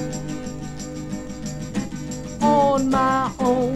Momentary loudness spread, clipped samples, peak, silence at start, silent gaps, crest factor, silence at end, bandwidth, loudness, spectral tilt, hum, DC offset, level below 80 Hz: 14 LU; under 0.1%; -6 dBFS; 0 s; none; 16 dB; 0 s; 13.5 kHz; -23 LUFS; -5.5 dB/octave; none; under 0.1%; -42 dBFS